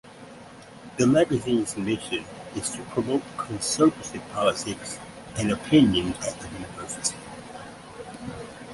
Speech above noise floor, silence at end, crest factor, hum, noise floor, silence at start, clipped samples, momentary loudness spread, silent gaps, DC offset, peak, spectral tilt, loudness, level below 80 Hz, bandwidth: 20 dB; 0 s; 20 dB; none; -45 dBFS; 0.05 s; under 0.1%; 20 LU; none; under 0.1%; -6 dBFS; -4.5 dB/octave; -25 LUFS; -52 dBFS; 11.5 kHz